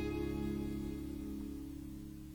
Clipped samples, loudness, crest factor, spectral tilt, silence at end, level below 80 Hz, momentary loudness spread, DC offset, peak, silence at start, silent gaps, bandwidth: under 0.1%; -43 LUFS; 14 dB; -7.5 dB/octave; 0 s; -50 dBFS; 9 LU; under 0.1%; -28 dBFS; 0 s; none; over 20 kHz